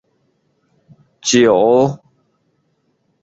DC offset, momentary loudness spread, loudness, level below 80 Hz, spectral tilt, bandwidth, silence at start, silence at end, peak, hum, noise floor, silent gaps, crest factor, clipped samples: under 0.1%; 12 LU; -13 LUFS; -58 dBFS; -4 dB/octave; 8 kHz; 1.25 s; 1.25 s; -2 dBFS; none; -64 dBFS; none; 16 dB; under 0.1%